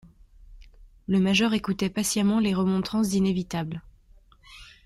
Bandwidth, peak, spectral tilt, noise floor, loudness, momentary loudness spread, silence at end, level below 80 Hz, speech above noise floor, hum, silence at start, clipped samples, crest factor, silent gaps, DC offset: 15 kHz; -10 dBFS; -5 dB/octave; -55 dBFS; -25 LUFS; 13 LU; 0.2 s; -52 dBFS; 31 dB; none; 0.4 s; under 0.1%; 18 dB; none; under 0.1%